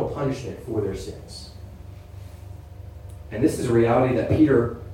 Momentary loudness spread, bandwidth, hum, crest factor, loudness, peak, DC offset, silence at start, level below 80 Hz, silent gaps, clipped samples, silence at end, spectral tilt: 23 LU; 16 kHz; none; 18 dB; -22 LUFS; -6 dBFS; under 0.1%; 0 s; -42 dBFS; none; under 0.1%; 0 s; -7.5 dB/octave